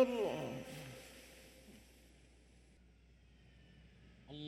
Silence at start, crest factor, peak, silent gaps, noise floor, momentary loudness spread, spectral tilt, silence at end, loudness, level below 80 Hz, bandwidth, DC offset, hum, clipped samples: 0 s; 24 dB; -20 dBFS; none; -65 dBFS; 27 LU; -5.5 dB/octave; 0 s; -43 LUFS; -66 dBFS; 16.5 kHz; under 0.1%; none; under 0.1%